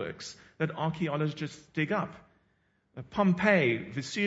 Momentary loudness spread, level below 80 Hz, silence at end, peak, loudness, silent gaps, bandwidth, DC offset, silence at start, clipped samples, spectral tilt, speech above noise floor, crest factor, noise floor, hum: 18 LU; -64 dBFS; 0 s; -8 dBFS; -30 LUFS; none; 8 kHz; under 0.1%; 0 s; under 0.1%; -6 dB/octave; 42 dB; 22 dB; -72 dBFS; none